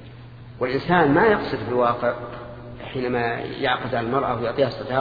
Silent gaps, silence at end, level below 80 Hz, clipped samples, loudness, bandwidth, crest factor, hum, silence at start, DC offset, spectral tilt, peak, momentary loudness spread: none; 0 s; -48 dBFS; under 0.1%; -22 LUFS; 5 kHz; 20 dB; none; 0 s; under 0.1%; -8.5 dB/octave; -4 dBFS; 19 LU